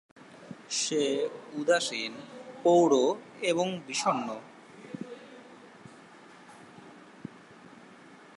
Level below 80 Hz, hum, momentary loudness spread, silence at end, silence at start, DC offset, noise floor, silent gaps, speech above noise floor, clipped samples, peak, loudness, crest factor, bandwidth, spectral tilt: -82 dBFS; none; 26 LU; 0.2 s; 0.2 s; under 0.1%; -52 dBFS; none; 25 dB; under 0.1%; -12 dBFS; -28 LUFS; 20 dB; 11.5 kHz; -3.5 dB/octave